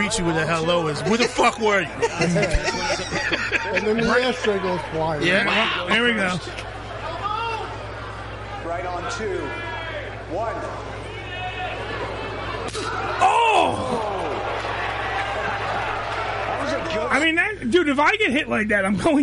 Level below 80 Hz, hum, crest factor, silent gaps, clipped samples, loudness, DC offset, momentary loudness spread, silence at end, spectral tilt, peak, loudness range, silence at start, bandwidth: -40 dBFS; none; 16 dB; none; under 0.1%; -22 LUFS; under 0.1%; 12 LU; 0 s; -4.5 dB/octave; -6 dBFS; 8 LU; 0 s; 11.5 kHz